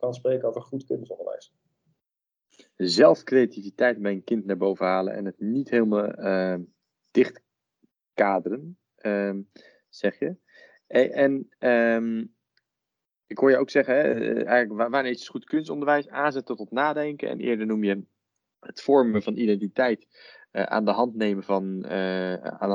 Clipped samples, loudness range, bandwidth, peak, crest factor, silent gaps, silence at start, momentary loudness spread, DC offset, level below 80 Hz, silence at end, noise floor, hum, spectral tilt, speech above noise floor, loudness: under 0.1%; 4 LU; 9.6 kHz; -4 dBFS; 20 dB; none; 0 s; 12 LU; under 0.1%; -76 dBFS; 0 s; -89 dBFS; none; -6.5 dB/octave; 65 dB; -25 LUFS